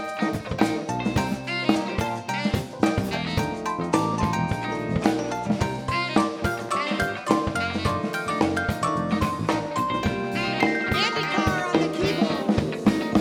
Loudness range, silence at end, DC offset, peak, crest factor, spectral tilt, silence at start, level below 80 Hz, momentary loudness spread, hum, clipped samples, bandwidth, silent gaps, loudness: 2 LU; 0 s; under 0.1%; -2 dBFS; 22 dB; -5.5 dB/octave; 0 s; -42 dBFS; 4 LU; none; under 0.1%; 17.5 kHz; none; -25 LUFS